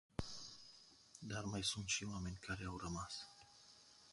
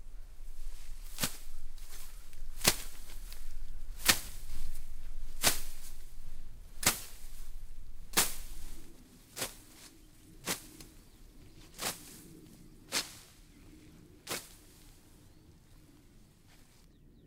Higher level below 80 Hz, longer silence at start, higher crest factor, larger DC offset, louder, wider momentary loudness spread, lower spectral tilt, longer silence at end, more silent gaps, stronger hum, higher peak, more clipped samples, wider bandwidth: second, -62 dBFS vs -44 dBFS; first, 0.2 s vs 0 s; second, 22 dB vs 32 dB; neither; second, -45 LUFS vs -34 LUFS; second, 20 LU vs 26 LU; first, -3 dB/octave vs -1 dB/octave; second, 0 s vs 0.65 s; neither; neither; second, -26 dBFS vs -4 dBFS; neither; second, 11.5 kHz vs 16 kHz